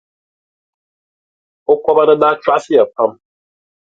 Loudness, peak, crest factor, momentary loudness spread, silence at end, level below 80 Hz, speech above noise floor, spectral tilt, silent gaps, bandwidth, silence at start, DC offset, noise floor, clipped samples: -13 LUFS; 0 dBFS; 16 dB; 8 LU; 0.85 s; -60 dBFS; over 78 dB; -5.5 dB/octave; none; 7.8 kHz; 1.7 s; under 0.1%; under -90 dBFS; under 0.1%